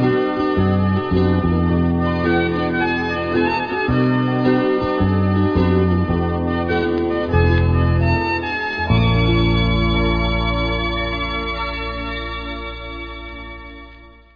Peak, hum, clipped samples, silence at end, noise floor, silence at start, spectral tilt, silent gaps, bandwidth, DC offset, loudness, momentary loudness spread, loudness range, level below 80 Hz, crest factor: -2 dBFS; none; under 0.1%; 0.25 s; -42 dBFS; 0 s; -8.5 dB/octave; none; 5.4 kHz; under 0.1%; -18 LUFS; 11 LU; 5 LU; -28 dBFS; 16 dB